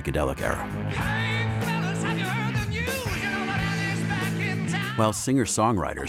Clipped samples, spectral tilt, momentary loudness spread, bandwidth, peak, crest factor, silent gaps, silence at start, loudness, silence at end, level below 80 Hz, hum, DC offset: under 0.1%; -5 dB/octave; 4 LU; 16.5 kHz; -8 dBFS; 18 dB; none; 0 s; -26 LUFS; 0 s; -42 dBFS; none; under 0.1%